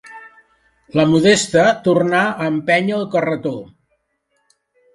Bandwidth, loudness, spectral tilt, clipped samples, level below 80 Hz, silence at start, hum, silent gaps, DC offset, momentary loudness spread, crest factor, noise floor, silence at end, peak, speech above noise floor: 11.5 kHz; -16 LUFS; -5 dB/octave; under 0.1%; -56 dBFS; 0.05 s; none; none; under 0.1%; 10 LU; 18 dB; -67 dBFS; 1.3 s; 0 dBFS; 52 dB